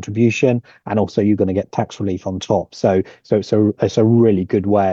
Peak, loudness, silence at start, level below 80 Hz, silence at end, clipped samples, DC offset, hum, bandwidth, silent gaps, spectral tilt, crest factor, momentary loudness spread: -2 dBFS; -17 LUFS; 0 s; -58 dBFS; 0 s; under 0.1%; under 0.1%; none; 7.6 kHz; none; -7.5 dB/octave; 14 dB; 8 LU